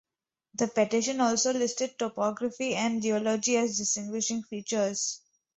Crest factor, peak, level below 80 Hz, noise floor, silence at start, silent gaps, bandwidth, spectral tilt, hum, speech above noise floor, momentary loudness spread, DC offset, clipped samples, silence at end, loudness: 18 dB; -12 dBFS; -72 dBFS; -84 dBFS; 0.55 s; none; 8.4 kHz; -3 dB/octave; none; 55 dB; 6 LU; under 0.1%; under 0.1%; 0.4 s; -28 LUFS